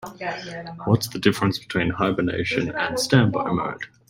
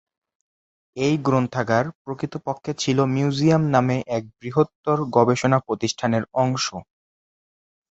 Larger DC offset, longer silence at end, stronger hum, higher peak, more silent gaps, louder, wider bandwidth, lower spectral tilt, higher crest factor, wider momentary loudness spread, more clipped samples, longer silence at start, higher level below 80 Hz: neither; second, 0.25 s vs 1.1 s; neither; about the same, -2 dBFS vs -2 dBFS; second, none vs 1.95-2.05 s, 4.75-4.84 s; about the same, -23 LUFS vs -22 LUFS; first, 16.5 kHz vs 8.2 kHz; about the same, -5.5 dB/octave vs -6 dB/octave; about the same, 20 dB vs 20 dB; about the same, 12 LU vs 10 LU; neither; second, 0 s vs 0.95 s; first, -52 dBFS vs -58 dBFS